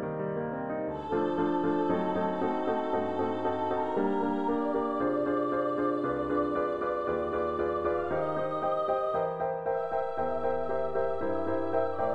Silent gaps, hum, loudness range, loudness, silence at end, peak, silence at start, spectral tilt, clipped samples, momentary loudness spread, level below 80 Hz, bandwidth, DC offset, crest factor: none; none; 1 LU; -30 LUFS; 0 s; -16 dBFS; 0 s; -8.5 dB/octave; under 0.1%; 3 LU; -58 dBFS; 8 kHz; under 0.1%; 14 dB